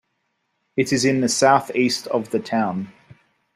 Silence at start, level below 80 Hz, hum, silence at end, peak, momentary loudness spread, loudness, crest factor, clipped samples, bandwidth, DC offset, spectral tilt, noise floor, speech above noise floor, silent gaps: 0.75 s; -62 dBFS; none; 0.65 s; -2 dBFS; 11 LU; -20 LUFS; 20 dB; under 0.1%; 15.5 kHz; under 0.1%; -4 dB/octave; -73 dBFS; 53 dB; none